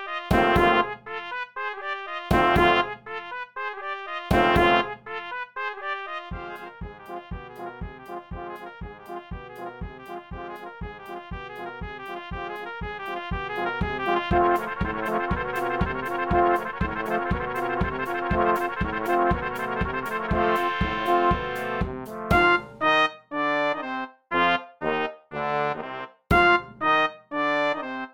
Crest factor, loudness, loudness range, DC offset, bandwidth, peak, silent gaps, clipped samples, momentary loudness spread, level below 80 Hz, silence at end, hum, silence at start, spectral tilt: 20 dB; -25 LUFS; 15 LU; 0.2%; 18 kHz; -6 dBFS; none; under 0.1%; 17 LU; -40 dBFS; 0 s; none; 0 s; -6 dB/octave